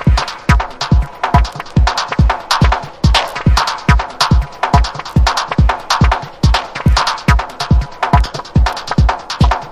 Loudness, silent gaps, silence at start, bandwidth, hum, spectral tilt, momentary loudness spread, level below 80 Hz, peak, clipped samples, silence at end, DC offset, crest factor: -14 LUFS; none; 0 s; 13.5 kHz; none; -5 dB/octave; 2 LU; -16 dBFS; 0 dBFS; under 0.1%; 0 s; under 0.1%; 12 dB